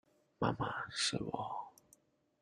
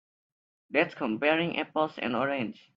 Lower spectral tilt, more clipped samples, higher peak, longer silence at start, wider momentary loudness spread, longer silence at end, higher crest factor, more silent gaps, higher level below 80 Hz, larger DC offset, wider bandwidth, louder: second, -3.5 dB/octave vs -7 dB/octave; neither; second, -18 dBFS vs -10 dBFS; second, 0.4 s vs 0.7 s; first, 10 LU vs 4 LU; first, 0.7 s vs 0.25 s; about the same, 24 dB vs 20 dB; neither; about the same, -68 dBFS vs -72 dBFS; neither; first, 13 kHz vs 7.2 kHz; second, -38 LUFS vs -29 LUFS